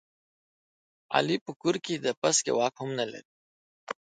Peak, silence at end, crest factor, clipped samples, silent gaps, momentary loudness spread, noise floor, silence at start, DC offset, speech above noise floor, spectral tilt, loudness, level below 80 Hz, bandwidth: -8 dBFS; 0.25 s; 24 dB; under 0.1%; 1.41-1.46 s, 1.56-1.60 s, 2.17-2.22 s, 3.25-3.87 s; 14 LU; under -90 dBFS; 1.1 s; under 0.1%; over 62 dB; -3 dB/octave; -28 LUFS; -78 dBFS; 9.6 kHz